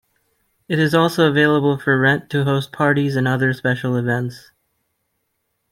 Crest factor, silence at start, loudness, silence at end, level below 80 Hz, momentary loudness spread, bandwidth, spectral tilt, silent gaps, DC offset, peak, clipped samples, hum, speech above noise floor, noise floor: 16 dB; 0.7 s; -18 LUFS; 1.35 s; -58 dBFS; 6 LU; 15.5 kHz; -6.5 dB/octave; none; under 0.1%; -2 dBFS; under 0.1%; none; 55 dB; -72 dBFS